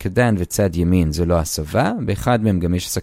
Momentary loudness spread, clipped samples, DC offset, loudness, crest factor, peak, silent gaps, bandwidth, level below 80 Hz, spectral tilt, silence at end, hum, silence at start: 3 LU; under 0.1%; under 0.1%; -19 LUFS; 16 dB; -2 dBFS; none; 16.5 kHz; -32 dBFS; -6 dB/octave; 0 s; none; 0 s